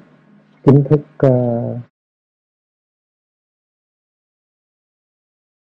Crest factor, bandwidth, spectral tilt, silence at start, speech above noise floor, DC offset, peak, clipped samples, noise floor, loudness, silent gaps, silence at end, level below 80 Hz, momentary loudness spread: 20 dB; 4.3 kHz; -11.5 dB/octave; 0.65 s; 36 dB; under 0.1%; 0 dBFS; under 0.1%; -50 dBFS; -15 LUFS; none; 3.85 s; -54 dBFS; 12 LU